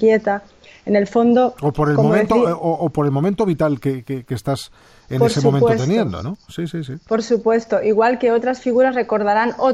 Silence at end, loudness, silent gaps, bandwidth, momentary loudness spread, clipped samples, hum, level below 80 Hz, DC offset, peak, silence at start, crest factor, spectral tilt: 0 s; -18 LUFS; none; 13 kHz; 11 LU; under 0.1%; none; -48 dBFS; under 0.1%; -4 dBFS; 0 s; 14 dB; -7 dB/octave